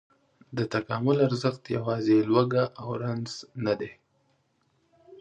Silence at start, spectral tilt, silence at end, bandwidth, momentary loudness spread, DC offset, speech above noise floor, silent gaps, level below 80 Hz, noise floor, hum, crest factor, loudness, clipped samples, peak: 0.5 s; -7 dB/octave; 0.05 s; 9.2 kHz; 10 LU; under 0.1%; 44 dB; none; -66 dBFS; -70 dBFS; none; 20 dB; -27 LUFS; under 0.1%; -8 dBFS